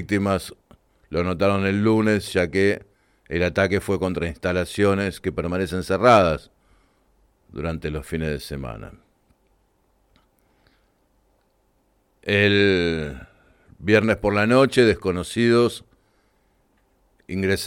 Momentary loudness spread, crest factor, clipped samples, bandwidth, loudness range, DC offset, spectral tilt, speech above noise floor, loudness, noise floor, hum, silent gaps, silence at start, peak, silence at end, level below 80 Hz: 15 LU; 18 dB; under 0.1%; 16.5 kHz; 12 LU; under 0.1%; -6 dB/octave; 44 dB; -21 LUFS; -65 dBFS; none; none; 0 s; -4 dBFS; 0 s; -46 dBFS